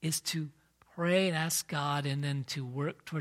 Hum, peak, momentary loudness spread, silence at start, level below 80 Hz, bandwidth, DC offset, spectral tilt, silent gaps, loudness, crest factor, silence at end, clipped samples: none; -16 dBFS; 9 LU; 0 s; -72 dBFS; 16 kHz; under 0.1%; -4 dB/octave; none; -32 LUFS; 18 dB; 0 s; under 0.1%